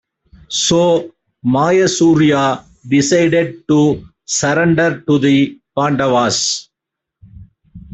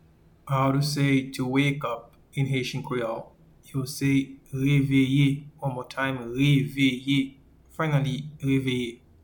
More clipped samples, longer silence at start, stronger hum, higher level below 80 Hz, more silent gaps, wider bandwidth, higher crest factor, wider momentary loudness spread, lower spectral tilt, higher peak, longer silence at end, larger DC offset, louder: neither; about the same, 0.5 s vs 0.45 s; neither; first, -48 dBFS vs -54 dBFS; neither; second, 8.4 kHz vs 19 kHz; about the same, 12 dB vs 16 dB; second, 8 LU vs 11 LU; second, -4.5 dB/octave vs -6.5 dB/octave; first, -2 dBFS vs -10 dBFS; second, 0 s vs 0.3 s; neither; first, -14 LUFS vs -26 LUFS